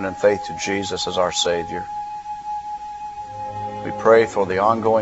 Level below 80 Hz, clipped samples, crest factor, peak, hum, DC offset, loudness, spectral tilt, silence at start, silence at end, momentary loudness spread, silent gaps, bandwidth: -52 dBFS; under 0.1%; 20 dB; 0 dBFS; none; under 0.1%; -21 LUFS; -3.5 dB/octave; 0 s; 0 s; 16 LU; none; 8.2 kHz